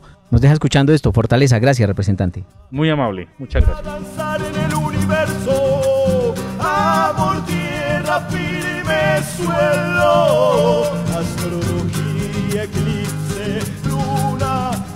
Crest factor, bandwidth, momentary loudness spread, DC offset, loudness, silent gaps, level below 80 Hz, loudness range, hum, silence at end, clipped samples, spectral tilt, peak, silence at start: 14 dB; 16 kHz; 9 LU; under 0.1%; -17 LUFS; none; -30 dBFS; 4 LU; none; 0 s; under 0.1%; -6 dB/octave; -4 dBFS; 0.3 s